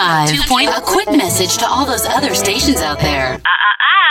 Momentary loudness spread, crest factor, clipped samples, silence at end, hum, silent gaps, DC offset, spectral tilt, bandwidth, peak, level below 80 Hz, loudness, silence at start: 4 LU; 12 dB; under 0.1%; 0 s; none; none; under 0.1%; -2.5 dB/octave; 17.5 kHz; 0 dBFS; -32 dBFS; -13 LUFS; 0 s